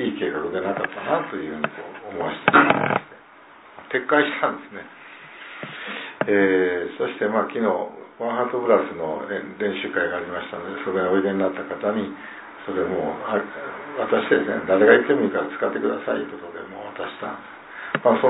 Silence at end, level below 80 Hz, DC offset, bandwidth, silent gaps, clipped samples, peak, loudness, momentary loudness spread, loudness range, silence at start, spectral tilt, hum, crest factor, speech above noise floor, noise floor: 0 s; -64 dBFS; under 0.1%; 4 kHz; none; under 0.1%; 0 dBFS; -23 LUFS; 17 LU; 5 LU; 0 s; -9.5 dB/octave; none; 22 dB; 25 dB; -47 dBFS